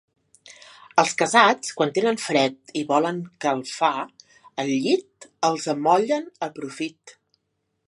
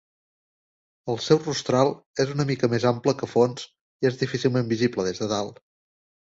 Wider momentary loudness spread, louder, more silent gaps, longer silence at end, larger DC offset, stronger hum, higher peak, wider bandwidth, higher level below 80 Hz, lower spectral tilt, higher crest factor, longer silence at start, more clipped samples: first, 13 LU vs 8 LU; about the same, -23 LUFS vs -24 LUFS; second, none vs 2.06-2.14 s, 3.81-4.00 s; about the same, 0.75 s vs 0.8 s; neither; neither; about the same, -2 dBFS vs -4 dBFS; first, 11.5 kHz vs 8 kHz; second, -76 dBFS vs -60 dBFS; second, -3.5 dB/octave vs -5.5 dB/octave; about the same, 22 dB vs 20 dB; second, 0.45 s vs 1.05 s; neither